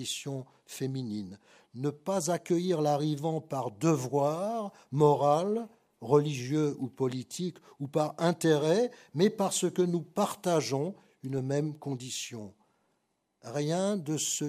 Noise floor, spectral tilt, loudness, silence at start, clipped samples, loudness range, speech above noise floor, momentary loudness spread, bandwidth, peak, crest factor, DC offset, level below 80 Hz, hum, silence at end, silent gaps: -78 dBFS; -5.5 dB/octave; -30 LUFS; 0 s; under 0.1%; 5 LU; 48 dB; 13 LU; 15.5 kHz; -10 dBFS; 20 dB; under 0.1%; -78 dBFS; none; 0 s; none